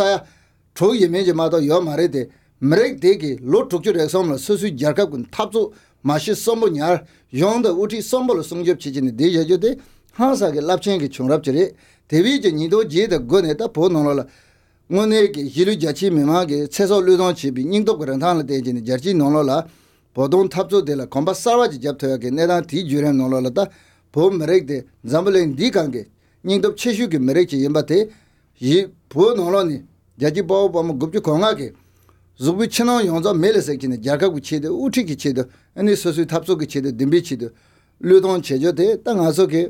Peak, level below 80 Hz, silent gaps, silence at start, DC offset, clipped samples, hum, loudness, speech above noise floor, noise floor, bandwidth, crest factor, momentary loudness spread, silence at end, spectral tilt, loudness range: -2 dBFS; -54 dBFS; none; 0 s; under 0.1%; under 0.1%; none; -18 LUFS; 37 dB; -54 dBFS; 16.5 kHz; 16 dB; 7 LU; 0 s; -6 dB/octave; 2 LU